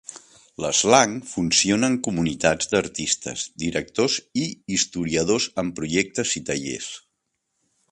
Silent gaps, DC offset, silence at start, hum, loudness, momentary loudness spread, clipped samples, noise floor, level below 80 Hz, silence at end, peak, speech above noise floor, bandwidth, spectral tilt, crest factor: none; under 0.1%; 0.1 s; none; -22 LUFS; 11 LU; under 0.1%; -76 dBFS; -52 dBFS; 0.95 s; 0 dBFS; 54 dB; 11.5 kHz; -3 dB/octave; 22 dB